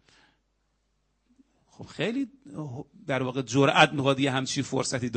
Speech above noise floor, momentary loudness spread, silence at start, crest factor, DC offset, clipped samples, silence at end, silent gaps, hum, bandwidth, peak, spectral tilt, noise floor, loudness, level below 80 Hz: 47 dB; 19 LU; 1.8 s; 26 dB; under 0.1%; under 0.1%; 0 s; none; none; 8.4 kHz; -4 dBFS; -4.5 dB/octave; -73 dBFS; -25 LUFS; -66 dBFS